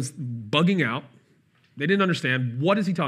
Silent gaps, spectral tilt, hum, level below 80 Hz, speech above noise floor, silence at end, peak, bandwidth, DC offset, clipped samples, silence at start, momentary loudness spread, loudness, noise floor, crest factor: none; -6 dB/octave; none; -78 dBFS; 38 dB; 0 s; -6 dBFS; 12.5 kHz; under 0.1%; under 0.1%; 0 s; 10 LU; -24 LUFS; -62 dBFS; 18 dB